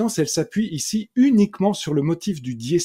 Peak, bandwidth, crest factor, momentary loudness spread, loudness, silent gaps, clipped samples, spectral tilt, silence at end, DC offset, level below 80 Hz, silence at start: -6 dBFS; 16 kHz; 14 dB; 8 LU; -21 LUFS; none; under 0.1%; -5.5 dB/octave; 0 s; under 0.1%; -58 dBFS; 0 s